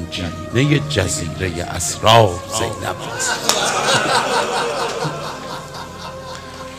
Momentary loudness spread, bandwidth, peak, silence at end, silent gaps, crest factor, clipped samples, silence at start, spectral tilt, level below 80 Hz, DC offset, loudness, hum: 17 LU; 16 kHz; 0 dBFS; 0 s; none; 20 dB; under 0.1%; 0 s; -3.5 dB/octave; -44 dBFS; under 0.1%; -18 LUFS; none